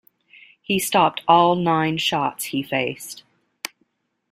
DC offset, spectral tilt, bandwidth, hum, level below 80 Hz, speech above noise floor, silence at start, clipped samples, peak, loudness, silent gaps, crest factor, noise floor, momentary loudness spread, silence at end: under 0.1%; -4 dB/octave; 16 kHz; none; -62 dBFS; 49 dB; 0.7 s; under 0.1%; -2 dBFS; -20 LUFS; none; 20 dB; -69 dBFS; 18 LU; 1.1 s